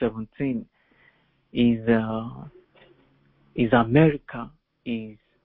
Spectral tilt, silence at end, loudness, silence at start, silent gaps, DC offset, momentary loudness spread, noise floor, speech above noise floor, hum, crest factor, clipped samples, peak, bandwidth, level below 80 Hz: -11.5 dB/octave; 0.3 s; -24 LUFS; 0 s; none; under 0.1%; 20 LU; -62 dBFS; 39 dB; none; 22 dB; under 0.1%; -4 dBFS; 4 kHz; -52 dBFS